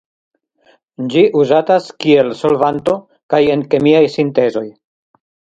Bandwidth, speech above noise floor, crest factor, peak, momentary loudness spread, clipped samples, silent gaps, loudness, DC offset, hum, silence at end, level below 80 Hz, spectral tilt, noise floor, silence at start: 7.8 kHz; 41 dB; 14 dB; 0 dBFS; 8 LU; under 0.1%; 3.23-3.29 s; -14 LUFS; under 0.1%; none; 0.9 s; -56 dBFS; -7 dB/octave; -54 dBFS; 1 s